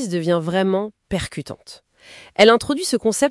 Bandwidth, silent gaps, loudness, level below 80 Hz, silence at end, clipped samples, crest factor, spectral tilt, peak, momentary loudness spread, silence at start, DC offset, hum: 12 kHz; none; -19 LUFS; -50 dBFS; 0 s; under 0.1%; 20 dB; -4.5 dB/octave; 0 dBFS; 18 LU; 0 s; under 0.1%; none